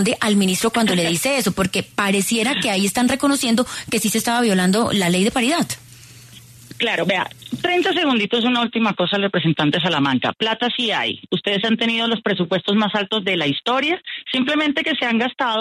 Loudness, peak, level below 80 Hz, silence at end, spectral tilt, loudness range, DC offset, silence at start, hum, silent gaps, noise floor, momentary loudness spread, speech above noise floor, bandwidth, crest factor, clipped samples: -19 LUFS; -6 dBFS; -56 dBFS; 0 s; -4 dB/octave; 2 LU; under 0.1%; 0 s; none; none; -43 dBFS; 4 LU; 24 dB; 14 kHz; 14 dB; under 0.1%